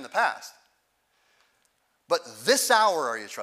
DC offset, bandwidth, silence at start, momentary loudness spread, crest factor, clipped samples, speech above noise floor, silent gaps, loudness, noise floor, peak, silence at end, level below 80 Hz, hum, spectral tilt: under 0.1%; 16 kHz; 0 s; 13 LU; 20 dB; under 0.1%; 46 dB; none; -24 LUFS; -71 dBFS; -6 dBFS; 0 s; -86 dBFS; none; -0.5 dB/octave